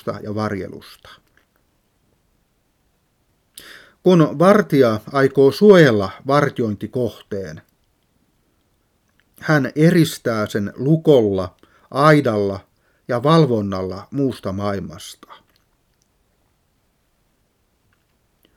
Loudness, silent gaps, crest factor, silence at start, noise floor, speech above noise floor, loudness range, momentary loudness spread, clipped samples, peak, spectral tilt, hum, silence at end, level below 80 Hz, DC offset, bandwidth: -17 LUFS; none; 20 dB; 0.05 s; -64 dBFS; 48 dB; 14 LU; 17 LU; under 0.1%; 0 dBFS; -7 dB/octave; none; 3.45 s; -58 dBFS; under 0.1%; 16 kHz